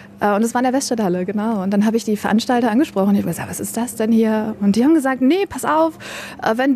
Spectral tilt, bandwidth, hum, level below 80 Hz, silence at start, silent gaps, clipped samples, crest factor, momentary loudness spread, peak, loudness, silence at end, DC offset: -5.5 dB/octave; 14 kHz; none; -56 dBFS; 0 s; none; under 0.1%; 12 dB; 8 LU; -4 dBFS; -18 LUFS; 0 s; under 0.1%